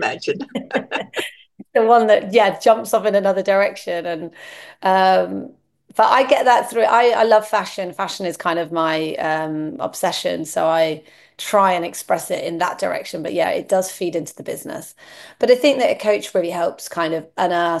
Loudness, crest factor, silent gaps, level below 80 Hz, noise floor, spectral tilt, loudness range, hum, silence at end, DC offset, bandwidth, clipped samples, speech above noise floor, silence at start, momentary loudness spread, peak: -18 LUFS; 18 dB; none; -70 dBFS; -39 dBFS; -4 dB/octave; 5 LU; none; 0 s; under 0.1%; 12.5 kHz; under 0.1%; 20 dB; 0 s; 13 LU; -2 dBFS